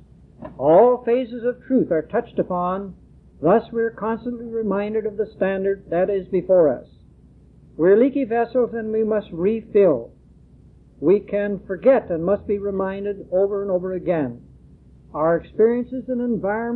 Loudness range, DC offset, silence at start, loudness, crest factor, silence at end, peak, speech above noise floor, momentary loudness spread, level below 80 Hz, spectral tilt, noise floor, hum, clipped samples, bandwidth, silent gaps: 3 LU; under 0.1%; 0.4 s; -21 LUFS; 16 dB; 0 s; -4 dBFS; 29 dB; 10 LU; -52 dBFS; -11 dB/octave; -49 dBFS; none; under 0.1%; 4.3 kHz; none